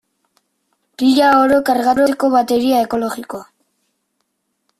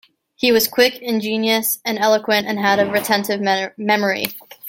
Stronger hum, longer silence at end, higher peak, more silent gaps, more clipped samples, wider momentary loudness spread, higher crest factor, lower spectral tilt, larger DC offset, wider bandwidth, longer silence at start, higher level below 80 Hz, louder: neither; first, 1.35 s vs 0 s; about the same, -2 dBFS vs 0 dBFS; neither; neither; first, 14 LU vs 5 LU; about the same, 14 dB vs 18 dB; about the same, -4 dB/octave vs -3 dB/octave; neither; second, 14.5 kHz vs 17 kHz; first, 1 s vs 0.4 s; first, -56 dBFS vs -62 dBFS; first, -14 LUFS vs -18 LUFS